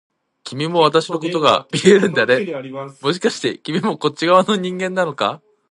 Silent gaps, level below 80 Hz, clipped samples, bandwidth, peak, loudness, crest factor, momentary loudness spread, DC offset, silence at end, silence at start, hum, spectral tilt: none; -64 dBFS; under 0.1%; 11.5 kHz; 0 dBFS; -17 LUFS; 18 dB; 12 LU; under 0.1%; 0.35 s; 0.45 s; none; -5 dB/octave